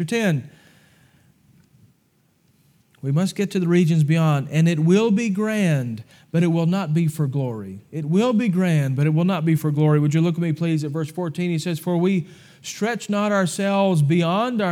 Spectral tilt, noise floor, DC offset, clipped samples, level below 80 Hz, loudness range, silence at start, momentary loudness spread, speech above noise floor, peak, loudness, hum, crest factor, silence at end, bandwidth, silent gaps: -7 dB/octave; -63 dBFS; under 0.1%; under 0.1%; -72 dBFS; 4 LU; 0 s; 9 LU; 43 dB; -6 dBFS; -21 LUFS; none; 14 dB; 0 s; 15 kHz; none